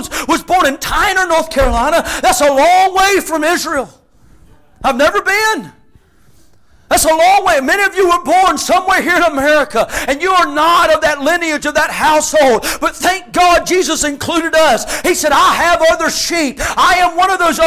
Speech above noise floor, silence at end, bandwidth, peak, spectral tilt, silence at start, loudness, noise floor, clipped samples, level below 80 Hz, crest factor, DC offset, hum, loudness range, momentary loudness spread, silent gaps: 38 dB; 0 s; 16 kHz; -2 dBFS; -2 dB/octave; 0 s; -12 LUFS; -50 dBFS; under 0.1%; -34 dBFS; 10 dB; under 0.1%; none; 3 LU; 6 LU; none